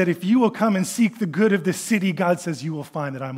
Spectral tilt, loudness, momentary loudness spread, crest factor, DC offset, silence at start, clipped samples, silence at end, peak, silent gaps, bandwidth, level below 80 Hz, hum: -6 dB/octave; -22 LUFS; 9 LU; 16 dB; under 0.1%; 0 s; under 0.1%; 0 s; -6 dBFS; none; 16 kHz; -74 dBFS; none